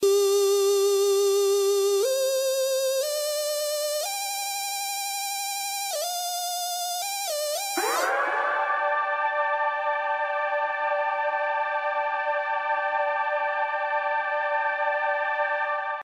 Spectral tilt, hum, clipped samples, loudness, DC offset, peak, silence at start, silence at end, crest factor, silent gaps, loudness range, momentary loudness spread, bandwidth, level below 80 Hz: 1 dB/octave; none; under 0.1%; -25 LUFS; under 0.1%; -14 dBFS; 0 s; 0 s; 12 dB; none; 4 LU; 6 LU; 16 kHz; -86 dBFS